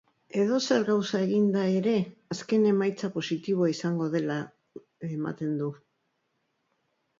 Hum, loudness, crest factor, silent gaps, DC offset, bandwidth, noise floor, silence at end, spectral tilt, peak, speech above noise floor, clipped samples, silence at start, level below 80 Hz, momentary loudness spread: none; -28 LUFS; 16 dB; none; under 0.1%; 7.6 kHz; -76 dBFS; 1.45 s; -6 dB/octave; -12 dBFS; 50 dB; under 0.1%; 0.35 s; -74 dBFS; 11 LU